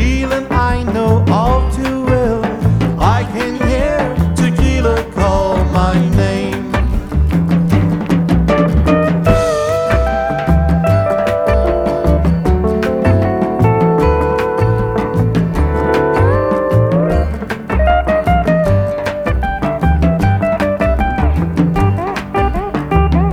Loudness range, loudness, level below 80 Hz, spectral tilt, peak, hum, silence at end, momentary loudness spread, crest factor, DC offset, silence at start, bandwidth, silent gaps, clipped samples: 1 LU; -14 LUFS; -20 dBFS; -7.5 dB/octave; 0 dBFS; none; 0 s; 4 LU; 12 dB; under 0.1%; 0 s; 14.5 kHz; none; under 0.1%